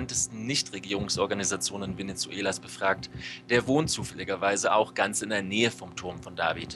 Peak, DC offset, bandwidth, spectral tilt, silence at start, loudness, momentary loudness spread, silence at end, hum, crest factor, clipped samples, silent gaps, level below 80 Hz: -10 dBFS; under 0.1%; 13 kHz; -3 dB/octave; 0 s; -28 LUFS; 10 LU; 0 s; 60 Hz at -50 dBFS; 20 dB; under 0.1%; none; -56 dBFS